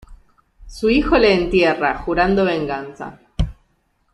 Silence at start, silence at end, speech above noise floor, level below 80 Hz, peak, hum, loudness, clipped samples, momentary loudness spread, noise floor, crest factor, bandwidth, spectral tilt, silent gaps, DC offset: 0.1 s; 0.6 s; 47 dB; -32 dBFS; -2 dBFS; none; -18 LUFS; under 0.1%; 14 LU; -64 dBFS; 16 dB; 12 kHz; -6.5 dB/octave; none; under 0.1%